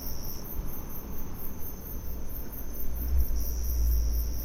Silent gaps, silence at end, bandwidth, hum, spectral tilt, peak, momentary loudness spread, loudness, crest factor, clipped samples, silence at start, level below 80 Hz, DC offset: none; 0 s; 16 kHz; none; -5.5 dB/octave; -12 dBFS; 10 LU; -35 LUFS; 16 dB; under 0.1%; 0 s; -32 dBFS; under 0.1%